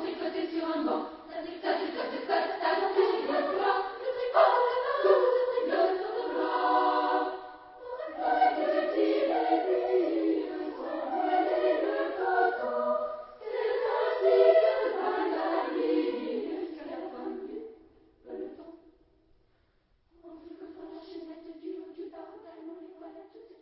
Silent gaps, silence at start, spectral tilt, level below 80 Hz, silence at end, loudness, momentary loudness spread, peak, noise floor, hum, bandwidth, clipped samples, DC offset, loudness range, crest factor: none; 0 s; -7 dB/octave; -72 dBFS; 0.15 s; -28 LUFS; 21 LU; -10 dBFS; -69 dBFS; none; 5.8 kHz; under 0.1%; under 0.1%; 19 LU; 20 dB